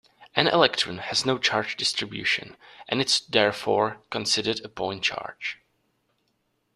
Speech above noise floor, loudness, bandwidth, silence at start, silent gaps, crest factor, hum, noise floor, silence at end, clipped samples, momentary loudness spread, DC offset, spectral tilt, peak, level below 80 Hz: 47 dB; -24 LUFS; 14 kHz; 0.2 s; none; 26 dB; none; -73 dBFS; 1.2 s; under 0.1%; 11 LU; under 0.1%; -2.5 dB/octave; -2 dBFS; -64 dBFS